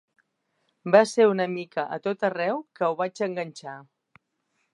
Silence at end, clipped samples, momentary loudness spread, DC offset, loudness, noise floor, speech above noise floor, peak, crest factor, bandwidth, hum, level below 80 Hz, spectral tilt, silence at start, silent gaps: 0.9 s; under 0.1%; 18 LU; under 0.1%; -25 LUFS; -75 dBFS; 51 dB; -2 dBFS; 24 dB; 11 kHz; none; -82 dBFS; -5.5 dB/octave; 0.85 s; none